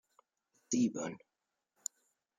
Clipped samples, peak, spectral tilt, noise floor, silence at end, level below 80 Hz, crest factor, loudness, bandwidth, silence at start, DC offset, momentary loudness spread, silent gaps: under 0.1%; -20 dBFS; -4.5 dB/octave; -86 dBFS; 1.2 s; -82 dBFS; 20 dB; -37 LUFS; 14.5 kHz; 0.7 s; under 0.1%; 12 LU; none